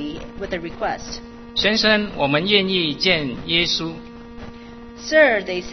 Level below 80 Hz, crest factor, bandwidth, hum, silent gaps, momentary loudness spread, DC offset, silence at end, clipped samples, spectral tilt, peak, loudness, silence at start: -44 dBFS; 20 dB; 6.4 kHz; none; none; 22 LU; under 0.1%; 0 s; under 0.1%; -4 dB/octave; 0 dBFS; -19 LUFS; 0 s